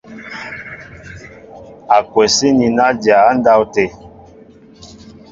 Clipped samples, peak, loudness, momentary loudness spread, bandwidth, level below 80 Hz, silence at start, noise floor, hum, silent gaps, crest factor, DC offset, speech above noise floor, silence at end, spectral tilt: under 0.1%; 0 dBFS; -12 LUFS; 23 LU; 7.8 kHz; -48 dBFS; 0.1 s; -42 dBFS; none; none; 16 dB; under 0.1%; 30 dB; 0.45 s; -3.5 dB/octave